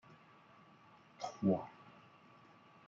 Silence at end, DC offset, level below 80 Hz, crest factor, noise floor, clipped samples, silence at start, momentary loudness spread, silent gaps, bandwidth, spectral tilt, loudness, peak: 1 s; under 0.1%; -84 dBFS; 22 dB; -64 dBFS; under 0.1%; 0.1 s; 27 LU; none; 7.4 kHz; -7.5 dB/octave; -39 LUFS; -22 dBFS